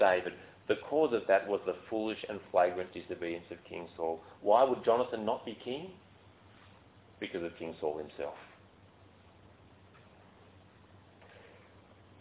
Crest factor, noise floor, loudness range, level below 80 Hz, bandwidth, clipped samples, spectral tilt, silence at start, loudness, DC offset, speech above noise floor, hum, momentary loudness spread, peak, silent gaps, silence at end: 24 dB; -60 dBFS; 12 LU; -68 dBFS; 4 kHz; under 0.1%; -3 dB/octave; 0 s; -34 LUFS; under 0.1%; 27 dB; none; 15 LU; -12 dBFS; none; 0.85 s